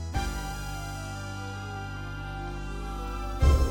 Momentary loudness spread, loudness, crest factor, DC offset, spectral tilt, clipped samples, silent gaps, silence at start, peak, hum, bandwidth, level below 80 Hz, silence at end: 11 LU; -33 LUFS; 20 dB; under 0.1%; -5.5 dB/octave; under 0.1%; none; 0 s; -10 dBFS; 50 Hz at -40 dBFS; 18 kHz; -32 dBFS; 0 s